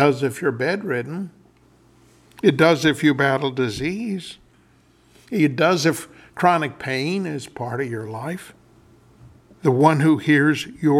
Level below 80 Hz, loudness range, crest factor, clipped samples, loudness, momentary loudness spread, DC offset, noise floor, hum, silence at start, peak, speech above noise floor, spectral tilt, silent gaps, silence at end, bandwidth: -58 dBFS; 4 LU; 20 dB; under 0.1%; -20 LUFS; 15 LU; under 0.1%; -56 dBFS; none; 0 s; -2 dBFS; 36 dB; -6 dB/octave; none; 0 s; 15 kHz